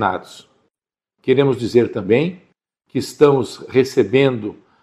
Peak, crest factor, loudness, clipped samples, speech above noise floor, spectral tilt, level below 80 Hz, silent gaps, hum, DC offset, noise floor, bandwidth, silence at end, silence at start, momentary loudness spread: 0 dBFS; 18 dB; -17 LUFS; under 0.1%; 67 dB; -6.5 dB/octave; -58 dBFS; none; none; under 0.1%; -83 dBFS; 13.5 kHz; 0.3 s; 0 s; 13 LU